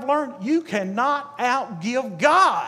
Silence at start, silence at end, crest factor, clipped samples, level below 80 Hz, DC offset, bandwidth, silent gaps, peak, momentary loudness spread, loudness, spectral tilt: 0 s; 0 s; 18 dB; under 0.1%; -80 dBFS; under 0.1%; 14 kHz; none; -4 dBFS; 9 LU; -22 LUFS; -4.5 dB/octave